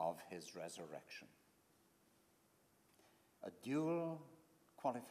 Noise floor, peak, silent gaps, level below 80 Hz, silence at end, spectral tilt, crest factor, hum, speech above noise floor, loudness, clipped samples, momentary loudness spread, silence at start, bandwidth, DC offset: -75 dBFS; -26 dBFS; none; under -90 dBFS; 0 s; -6 dB/octave; 22 dB; none; 29 dB; -47 LUFS; under 0.1%; 16 LU; 0 s; 15.5 kHz; under 0.1%